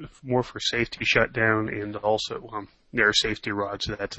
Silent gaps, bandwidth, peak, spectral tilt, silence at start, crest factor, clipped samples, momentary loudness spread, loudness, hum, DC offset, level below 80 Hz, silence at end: none; 8.6 kHz; -4 dBFS; -4 dB/octave; 0 s; 22 dB; under 0.1%; 11 LU; -25 LUFS; none; under 0.1%; -50 dBFS; 0 s